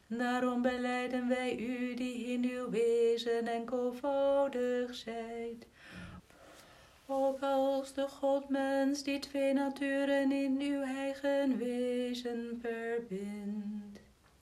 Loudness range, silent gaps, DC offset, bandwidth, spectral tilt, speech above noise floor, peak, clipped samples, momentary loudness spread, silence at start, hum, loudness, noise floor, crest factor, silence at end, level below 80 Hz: 4 LU; none; under 0.1%; 14 kHz; -5 dB/octave; 25 dB; -18 dBFS; under 0.1%; 10 LU; 0.1 s; none; -34 LUFS; -59 dBFS; 16 dB; 0.4 s; -68 dBFS